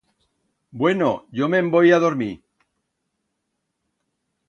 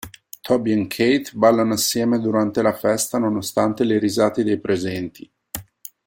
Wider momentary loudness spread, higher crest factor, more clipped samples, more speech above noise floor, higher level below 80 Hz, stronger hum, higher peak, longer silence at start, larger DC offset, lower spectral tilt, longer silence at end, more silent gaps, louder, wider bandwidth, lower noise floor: second, 12 LU vs 16 LU; about the same, 18 dB vs 18 dB; neither; first, 58 dB vs 21 dB; second, -64 dBFS vs -56 dBFS; neither; about the same, -4 dBFS vs -2 dBFS; first, 0.75 s vs 0.05 s; neither; first, -7 dB/octave vs -4.5 dB/octave; first, 2.1 s vs 0.45 s; neither; about the same, -19 LUFS vs -20 LUFS; second, 7.4 kHz vs 16.5 kHz; first, -77 dBFS vs -40 dBFS